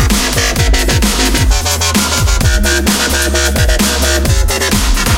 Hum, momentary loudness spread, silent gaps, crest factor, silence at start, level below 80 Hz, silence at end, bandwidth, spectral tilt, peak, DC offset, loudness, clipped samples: none; 1 LU; none; 10 dB; 0 s; -14 dBFS; 0 s; 17 kHz; -3.5 dB/octave; 0 dBFS; under 0.1%; -11 LUFS; under 0.1%